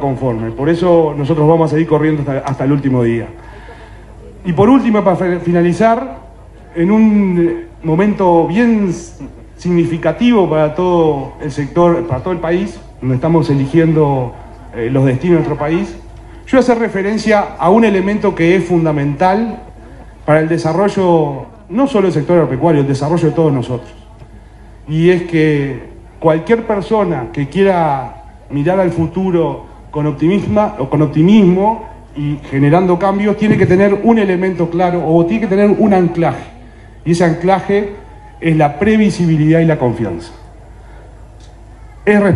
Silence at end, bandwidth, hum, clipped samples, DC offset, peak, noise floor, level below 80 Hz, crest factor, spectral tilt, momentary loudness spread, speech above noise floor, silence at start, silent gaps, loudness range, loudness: 0 s; 11 kHz; none; under 0.1%; under 0.1%; 0 dBFS; -36 dBFS; -38 dBFS; 12 dB; -8 dB/octave; 12 LU; 24 dB; 0 s; none; 3 LU; -13 LUFS